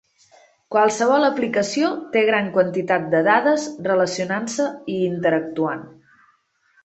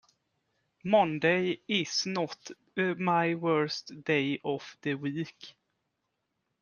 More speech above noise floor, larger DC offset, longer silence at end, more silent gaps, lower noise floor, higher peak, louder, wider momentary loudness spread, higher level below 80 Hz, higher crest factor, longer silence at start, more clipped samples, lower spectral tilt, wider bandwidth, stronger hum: second, 42 dB vs 52 dB; neither; second, 0.95 s vs 1.1 s; neither; second, -62 dBFS vs -82 dBFS; first, -2 dBFS vs -12 dBFS; first, -20 LUFS vs -30 LUFS; second, 7 LU vs 13 LU; first, -66 dBFS vs -74 dBFS; about the same, 18 dB vs 20 dB; second, 0.7 s vs 0.85 s; neither; about the same, -4.5 dB/octave vs -5 dB/octave; second, 8.4 kHz vs 10 kHz; neither